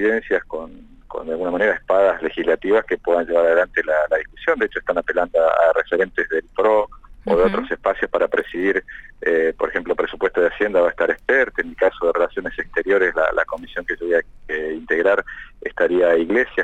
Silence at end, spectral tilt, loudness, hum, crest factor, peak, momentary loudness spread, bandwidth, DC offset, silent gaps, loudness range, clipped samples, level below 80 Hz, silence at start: 0 s; -6 dB/octave; -19 LUFS; none; 14 dB; -6 dBFS; 9 LU; 8 kHz; under 0.1%; none; 2 LU; under 0.1%; -44 dBFS; 0 s